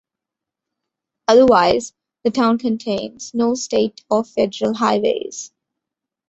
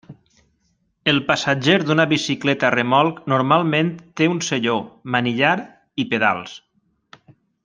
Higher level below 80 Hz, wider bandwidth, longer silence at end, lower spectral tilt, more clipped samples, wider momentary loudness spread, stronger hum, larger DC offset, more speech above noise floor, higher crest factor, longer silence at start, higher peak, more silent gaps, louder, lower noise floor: first, -56 dBFS vs -62 dBFS; second, 8.2 kHz vs 9.8 kHz; second, 0.85 s vs 1.05 s; about the same, -4.5 dB/octave vs -5 dB/octave; neither; first, 13 LU vs 8 LU; neither; neither; first, 68 dB vs 48 dB; about the same, 18 dB vs 18 dB; first, 1.3 s vs 0.1 s; about the same, -2 dBFS vs -2 dBFS; neither; about the same, -18 LUFS vs -19 LUFS; first, -85 dBFS vs -67 dBFS